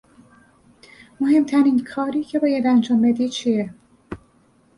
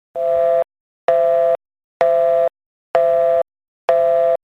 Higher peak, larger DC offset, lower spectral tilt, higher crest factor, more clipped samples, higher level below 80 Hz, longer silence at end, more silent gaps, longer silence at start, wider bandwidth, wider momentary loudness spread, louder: second, -6 dBFS vs 0 dBFS; neither; about the same, -6 dB/octave vs -5 dB/octave; about the same, 14 dB vs 16 dB; neither; first, -58 dBFS vs -64 dBFS; first, 0.6 s vs 0.1 s; second, none vs 0.80-1.08 s, 1.84-2.00 s, 2.66-2.94 s, 3.68-3.88 s; first, 1.2 s vs 0.15 s; first, 11 kHz vs 5.8 kHz; first, 21 LU vs 9 LU; about the same, -19 LUFS vs -17 LUFS